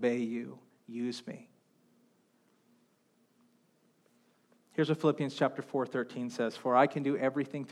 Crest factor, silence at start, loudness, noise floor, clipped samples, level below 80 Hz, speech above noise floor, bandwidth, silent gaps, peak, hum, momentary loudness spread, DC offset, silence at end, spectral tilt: 22 dB; 0 s; -32 LUFS; -71 dBFS; under 0.1%; under -90 dBFS; 39 dB; 12.5 kHz; none; -12 dBFS; none; 15 LU; under 0.1%; 0 s; -6.5 dB/octave